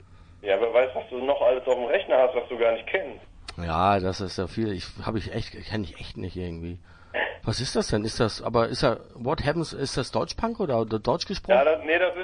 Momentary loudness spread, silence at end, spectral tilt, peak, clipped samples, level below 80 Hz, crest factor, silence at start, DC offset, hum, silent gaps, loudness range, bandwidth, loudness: 12 LU; 0 s; -5.5 dB/octave; -6 dBFS; under 0.1%; -46 dBFS; 20 dB; 0.1 s; under 0.1%; none; none; 7 LU; 10.5 kHz; -26 LUFS